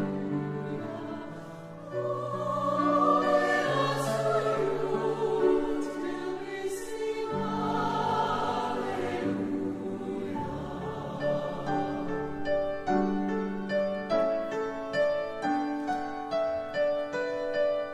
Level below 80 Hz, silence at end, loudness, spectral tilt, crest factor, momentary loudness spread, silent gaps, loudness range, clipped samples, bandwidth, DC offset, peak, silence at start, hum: -56 dBFS; 0 s; -30 LUFS; -6 dB/octave; 16 dB; 9 LU; none; 5 LU; under 0.1%; 14.5 kHz; under 0.1%; -14 dBFS; 0 s; none